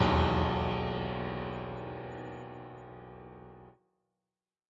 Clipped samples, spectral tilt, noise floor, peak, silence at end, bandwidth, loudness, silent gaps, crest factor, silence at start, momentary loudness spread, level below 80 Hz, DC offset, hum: under 0.1%; -7.5 dB/octave; under -90 dBFS; -14 dBFS; 1 s; 7.8 kHz; -34 LUFS; none; 20 dB; 0 s; 21 LU; -48 dBFS; under 0.1%; none